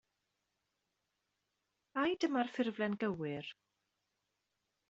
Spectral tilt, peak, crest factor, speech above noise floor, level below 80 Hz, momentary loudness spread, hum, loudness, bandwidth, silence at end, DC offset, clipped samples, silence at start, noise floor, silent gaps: -4 dB/octave; -22 dBFS; 20 dB; 49 dB; -80 dBFS; 10 LU; none; -37 LUFS; 8 kHz; 1.35 s; under 0.1%; under 0.1%; 1.95 s; -86 dBFS; none